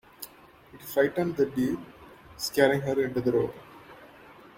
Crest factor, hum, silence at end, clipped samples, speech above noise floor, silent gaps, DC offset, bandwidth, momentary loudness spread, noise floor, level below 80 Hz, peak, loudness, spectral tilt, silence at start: 22 dB; none; 0.25 s; under 0.1%; 26 dB; none; under 0.1%; 16.5 kHz; 24 LU; -53 dBFS; -60 dBFS; -6 dBFS; -27 LUFS; -5.5 dB/octave; 0.2 s